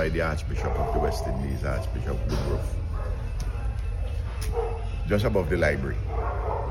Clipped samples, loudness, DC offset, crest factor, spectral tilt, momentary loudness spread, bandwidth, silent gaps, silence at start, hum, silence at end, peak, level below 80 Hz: under 0.1%; -28 LUFS; under 0.1%; 16 dB; -7 dB/octave; 8 LU; 13.5 kHz; none; 0 s; none; 0 s; -10 dBFS; -30 dBFS